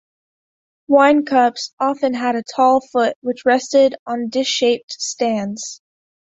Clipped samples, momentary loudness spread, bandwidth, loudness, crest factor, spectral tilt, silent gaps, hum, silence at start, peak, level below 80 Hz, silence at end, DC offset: under 0.1%; 9 LU; 8 kHz; -17 LUFS; 16 dB; -3 dB/octave; 1.73-1.77 s, 3.16-3.22 s, 3.99-4.06 s, 4.83-4.88 s; none; 0.9 s; -2 dBFS; -64 dBFS; 0.65 s; under 0.1%